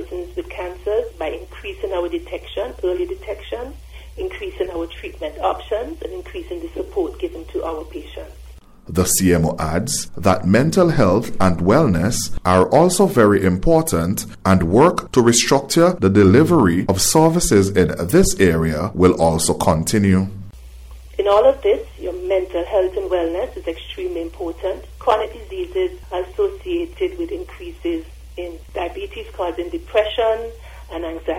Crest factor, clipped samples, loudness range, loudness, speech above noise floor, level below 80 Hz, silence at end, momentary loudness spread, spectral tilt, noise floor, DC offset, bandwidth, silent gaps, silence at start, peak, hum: 16 dB; under 0.1%; 12 LU; -18 LUFS; 19 dB; -36 dBFS; 0 s; 16 LU; -5 dB/octave; -37 dBFS; under 0.1%; 16 kHz; none; 0 s; -2 dBFS; none